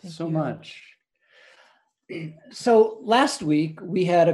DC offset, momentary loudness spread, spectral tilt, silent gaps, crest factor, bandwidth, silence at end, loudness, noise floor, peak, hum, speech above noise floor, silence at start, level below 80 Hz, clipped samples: under 0.1%; 19 LU; -5.5 dB/octave; none; 20 dB; 12 kHz; 0 s; -22 LUFS; -60 dBFS; -4 dBFS; none; 38 dB; 0.05 s; -70 dBFS; under 0.1%